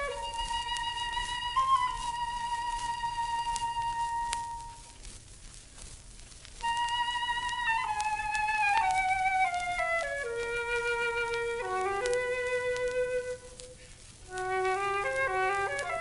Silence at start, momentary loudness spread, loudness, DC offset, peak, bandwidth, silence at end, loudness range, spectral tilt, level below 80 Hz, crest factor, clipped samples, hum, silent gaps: 0 s; 20 LU; -31 LUFS; under 0.1%; -6 dBFS; 11.5 kHz; 0 s; 7 LU; -2 dB/octave; -50 dBFS; 26 dB; under 0.1%; none; none